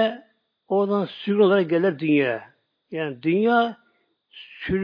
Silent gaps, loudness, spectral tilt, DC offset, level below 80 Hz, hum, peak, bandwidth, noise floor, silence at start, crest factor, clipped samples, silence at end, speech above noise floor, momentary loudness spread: none; -22 LUFS; -9 dB/octave; under 0.1%; -56 dBFS; none; -6 dBFS; 5.2 kHz; -67 dBFS; 0 s; 16 dB; under 0.1%; 0 s; 45 dB; 15 LU